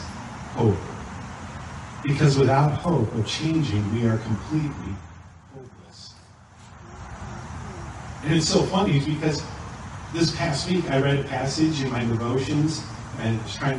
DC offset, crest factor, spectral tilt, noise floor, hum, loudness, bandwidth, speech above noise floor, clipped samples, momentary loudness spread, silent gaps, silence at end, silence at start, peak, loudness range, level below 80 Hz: under 0.1%; 18 dB; -6 dB/octave; -49 dBFS; none; -24 LUFS; 11 kHz; 26 dB; under 0.1%; 20 LU; none; 0 s; 0 s; -6 dBFS; 11 LU; -46 dBFS